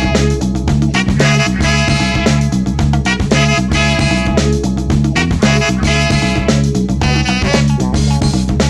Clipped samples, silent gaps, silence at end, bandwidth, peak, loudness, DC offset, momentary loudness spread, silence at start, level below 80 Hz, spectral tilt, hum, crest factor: under 0.1%; none; 0 s; 12 kHz; 0 dBFS; -13 LUFS; under 0.1%; 3 LU; 0 s; -20 dBFS; -5 dB/octave; none; 12 dB